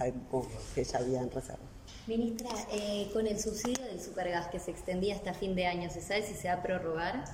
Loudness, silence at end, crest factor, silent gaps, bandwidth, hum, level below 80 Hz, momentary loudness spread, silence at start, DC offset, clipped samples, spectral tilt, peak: -35 LUFS; 0 s; 22 dB; none; 16 kHz; none; -52 dBFS; 7 LU; 0 s; under 0.1%; under 0.1%; -4.5 dB/octave; -12 dBFS